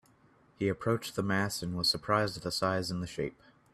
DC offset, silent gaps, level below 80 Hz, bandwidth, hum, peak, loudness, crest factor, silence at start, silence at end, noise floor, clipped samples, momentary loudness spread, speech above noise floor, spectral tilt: under 0.1%; none; -60 dBFS; 15.5 kHz; none; -12 dBFS; -32 LUFS; 22 dB; 0.6 s; 0.45 s; -64 dBFS; under 0.1%; 7 LU; 32 dB; -4.5 dB/octave